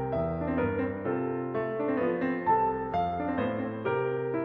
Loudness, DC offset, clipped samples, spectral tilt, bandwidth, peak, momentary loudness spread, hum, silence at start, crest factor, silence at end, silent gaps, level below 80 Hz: -30 LUFS; under 0.1%; under 0.1%; -10 dB/octave; 5.4 kHz; -14 dBFS; 5 LU; none; 0 s; 14 dB; 0 s; none; -52 dBFS